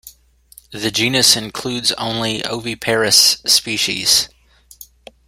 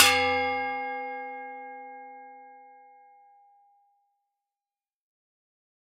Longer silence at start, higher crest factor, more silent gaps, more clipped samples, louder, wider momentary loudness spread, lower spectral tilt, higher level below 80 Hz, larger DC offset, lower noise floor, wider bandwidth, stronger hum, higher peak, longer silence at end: about the same, 0.05 s vs 0 s; second, 18 dB vs 30 dB; neither; neither; first, -14 LUFS vs -28 LUFS; second, 13 LU vs 24 LU; about the same, -1.5 dB/octave vs -0.5 dB/octave; first, -52 dBFS vs -76 dBFS; neither; second, -48 dBFS vs under -90 dBFS; about the same, 16.5 kHz vs 15.5 kHz; neither; about the same, 0 dBFS vs -2 dBFS; second, 0.45 s vs 3.15 s